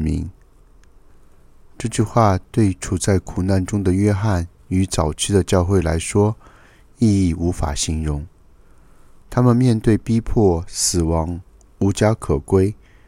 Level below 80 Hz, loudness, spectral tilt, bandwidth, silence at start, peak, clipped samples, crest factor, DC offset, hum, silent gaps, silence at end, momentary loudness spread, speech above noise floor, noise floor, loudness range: -34 dBFS; -19 LUFS; -6 dB/octave; 15.5 kHz; 0 s; -2 dBFS; under 0.1%; 18 dB; under 0.1%; none; none; 0.35 s; 8 LU; 31 dB; -48 dBFS; 3 LU